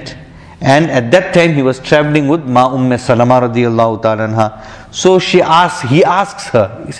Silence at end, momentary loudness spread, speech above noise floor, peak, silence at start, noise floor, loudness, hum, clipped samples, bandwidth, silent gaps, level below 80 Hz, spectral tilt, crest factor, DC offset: 0 s; 6 LU; 22 dB; 0 dBFS; 0 s; -33 dBFS; -11 LUFS; none; 0.4%; 11 kHz; none; -44 dBFS; -6 dB/octave; 12 dB; under 0.1%